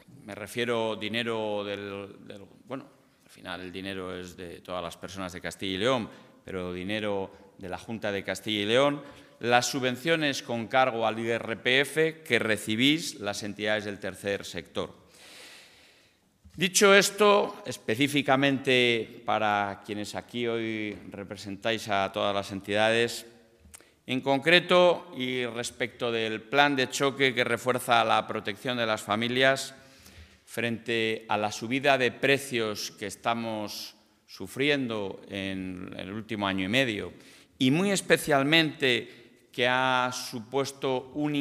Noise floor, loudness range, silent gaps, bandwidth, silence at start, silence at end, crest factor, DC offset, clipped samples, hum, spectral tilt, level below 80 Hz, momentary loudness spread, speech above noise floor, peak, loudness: -64 dBFS; 9 LU; none; 15.5 kHz; 0.1 s; 0 s; 24 dB; under 0.1%; under 0.1%; none; -3.5 dB/octave; -70 dBFS; 16 LU; 36 dB; -4 dBFS; -27 LUFS